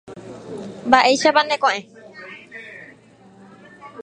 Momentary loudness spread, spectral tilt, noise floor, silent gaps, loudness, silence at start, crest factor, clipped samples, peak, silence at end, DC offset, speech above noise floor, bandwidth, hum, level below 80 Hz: 24 LU; -2.5 dB/octave; -48 dBFS; none; -17 LUFS; 0.1 s; 22 dB; under 0.1%; 0 dBFS; 0 s; under 0.1%; 32 dB; 11 kHz; none; -62 dBFS